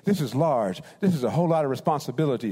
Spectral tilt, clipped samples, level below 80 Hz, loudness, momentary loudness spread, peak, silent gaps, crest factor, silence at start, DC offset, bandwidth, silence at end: -7.5 dB/octave; under 0.1%; -66 dBFS; -25 LUFS; 3 LU; -10 dBFS; none; 14 dB; 0.05 s; under 0.1%; 16 kHz; 0 s